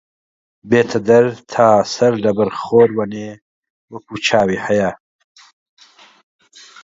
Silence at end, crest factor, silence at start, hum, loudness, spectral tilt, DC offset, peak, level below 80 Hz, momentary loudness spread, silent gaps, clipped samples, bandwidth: 1.9 s; 18 dB; 0.65 s; none; -15 LUFS; -5.5 dB/octave; under 0.1%; 0 dBFS; -54 dBFS; 16 LU; 3.42-3.63 s, 3.70-3.88 s; under 0.1%; 7.8 kHz